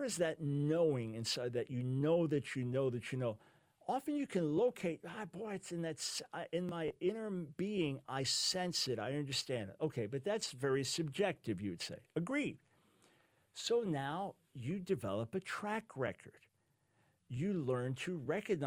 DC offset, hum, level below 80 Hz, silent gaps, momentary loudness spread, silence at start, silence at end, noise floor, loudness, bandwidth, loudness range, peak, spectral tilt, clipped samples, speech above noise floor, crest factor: under 0.1%; none; -74 dBFS; none; 9 LU; 0 s; 0 s; -78 dBFS; -39 LUFS; 16 kHz; 4 LU; -22 dBFS; -5 dB/octave; under 0.1%; 40 dB; 18 dB